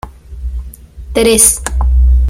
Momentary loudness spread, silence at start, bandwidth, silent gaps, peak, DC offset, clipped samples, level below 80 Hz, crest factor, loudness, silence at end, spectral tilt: 21 LU; 0.05 s; over 20 kHz; none; 0 dBFS; under 0.1%; 0.2%; -14 dBFS; 12 dB; -10 LUFS; 0 s; -4 dB/octave